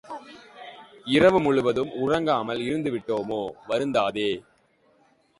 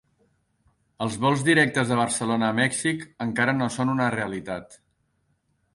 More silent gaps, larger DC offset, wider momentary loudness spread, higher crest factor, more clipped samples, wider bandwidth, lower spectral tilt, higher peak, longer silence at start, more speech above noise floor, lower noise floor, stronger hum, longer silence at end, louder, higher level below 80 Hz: neither; neither; first, 21 LU vs 11 LU; about the same, 20 dB vs 18 dB; neither; about the same, 11.5 kHz vs 11.5 kHz; first, -6 dB/octave vs -4.5 dB/octave; about the same, -6 dBFS vs -6 dBFS; second, 0.05 s vs 1 s; second, 39 dB vs 47 dB; second, -63 dBFS vs -70 dBFS; neither; about the same, 1 s vs 1 s; about the same, -24 LUFS vs -24 LUFS; about the same, -58 dBFS vs -60 dBFS